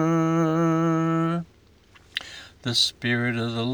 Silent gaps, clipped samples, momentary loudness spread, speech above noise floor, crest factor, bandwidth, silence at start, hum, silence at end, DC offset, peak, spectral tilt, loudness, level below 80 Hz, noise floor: none; under 0.1%; 12 LU; 31 dB; 16 dB; over 20 kHz; 0 s; none; 0 s; under 0.1%; -8 dBFS; -5 dB/octave; -24 LUFS; -60 dBFS; -55 dBFS